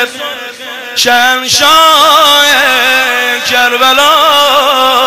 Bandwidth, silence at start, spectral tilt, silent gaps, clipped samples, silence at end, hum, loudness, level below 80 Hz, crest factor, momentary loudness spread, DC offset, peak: over 20 kHz; 0 s; 0 dB/octave; none; 1%; 0 s; none; -6 LUFS; -48 dBFS; 8 dB; 13 LU; 0.8%; 0 dBFS